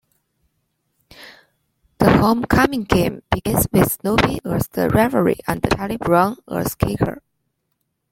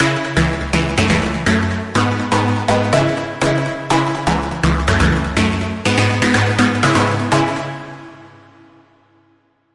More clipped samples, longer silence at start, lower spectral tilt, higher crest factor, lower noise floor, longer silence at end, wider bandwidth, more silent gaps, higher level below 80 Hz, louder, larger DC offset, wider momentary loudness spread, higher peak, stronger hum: neither; first, 1.2 s vs 0 s; about the same, -5.5 dB/octave vs -5.5 dB/octave; about the same, 18 dB vs 14 dB; first, -73 dBFS vs -58 dBFS; second, 0.95 s vs 1.45 s; first, 16.5 kHz vs 11.5 kHz; neither; second, -38 dBFS vs -30 dBFS; about the same, -18 LUFS vs -16 LUFS; neither; about the same, 7 LU vs 5 LU; about the same, -2 dBFS vs -2 dBFS; neither